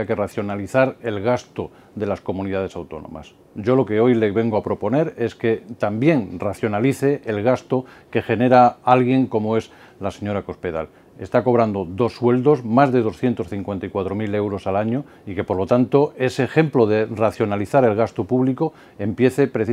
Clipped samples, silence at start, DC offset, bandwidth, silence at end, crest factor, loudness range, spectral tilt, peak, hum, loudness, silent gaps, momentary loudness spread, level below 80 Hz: under 0.1%; 0 s; under 0.1%; 13.5 kHz; 0 s; 20 dB; 4 LU; -8 dB/octave; 0 dBFS; none; -20 LUFS; none; 11 LU; -54 dBFS